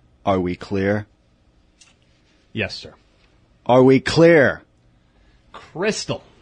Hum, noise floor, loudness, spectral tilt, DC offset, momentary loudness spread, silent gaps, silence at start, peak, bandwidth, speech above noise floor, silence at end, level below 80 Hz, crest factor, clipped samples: none; -58 dBFS; -18 LUFS; -6 dB/octave; under 0.1%; 20 LU; none; 0.25 s; -2 dBFS; 10 kHz; 40 dB; 0.25 s; -52 dBFS; 18 dB; under 0.1%